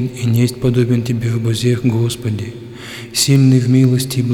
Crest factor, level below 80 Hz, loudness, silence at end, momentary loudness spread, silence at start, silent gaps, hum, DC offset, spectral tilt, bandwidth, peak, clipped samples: 14 dB; -46 dBFS; -15 LUFS; 0 s; 14 LU; 0 s; none; none; under 0.1%; -6 dB/octave; 16.5 kHz; -2 dBFS; under 0.1%